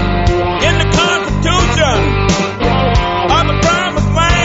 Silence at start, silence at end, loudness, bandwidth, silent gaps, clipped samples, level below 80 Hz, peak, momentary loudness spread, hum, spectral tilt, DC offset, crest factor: 0 s; 0 s; -12 LUFS; 8 kHz; none; under 0.1%; -20 dBFS; 0 dBFS; 3 LU; none; -5 dB/octave; under 0.1%; 12 dB